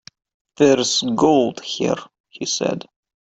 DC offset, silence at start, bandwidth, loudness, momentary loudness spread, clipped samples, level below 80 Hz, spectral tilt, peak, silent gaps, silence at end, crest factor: under 0.1%; 0.6 s; 8.4 kHz; -19 LUFS; 11 LU; under 0.1%; -60 dBFS; -4 dB/octave; -2 dBFS; 2.20-2.24 s; 0.45 s; 20 dB